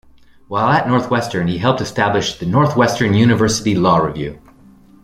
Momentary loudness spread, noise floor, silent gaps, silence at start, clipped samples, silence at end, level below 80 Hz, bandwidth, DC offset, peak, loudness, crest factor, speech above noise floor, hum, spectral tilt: 7 LU; -45 dBFS; none; 0.5 s; under 0.1%; 0.65 s; -44 dBFS; 15.5 kHz; under 0.1%; -2 dBFS; -16 LUFS; 14 dB; 30 dB; none; -5.5 dB/octave